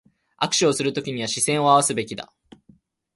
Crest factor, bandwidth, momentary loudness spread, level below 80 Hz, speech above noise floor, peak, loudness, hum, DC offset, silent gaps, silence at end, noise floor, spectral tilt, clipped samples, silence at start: 20 dB; 12 kHz; 15 LU; -64 dBFS; 36 dB; -2 dBFS; -21 LUFS; none; under 0.1%; none; 0.9 s; -57 dBFS; -3 dB/octave; under 0.1%; 0.4 s